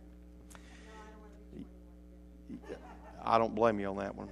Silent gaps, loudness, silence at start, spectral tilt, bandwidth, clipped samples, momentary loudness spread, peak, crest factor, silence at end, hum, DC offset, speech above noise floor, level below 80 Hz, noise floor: none; -33 LUFS; 0 s; -6.5 dB/octave; 12.5 kHz; under 0.1%; 25 LU; -12 dBFS; 24 dB; 0 s; none; under 0.1%; 22 dB; -56 dBFS; -54 dBFS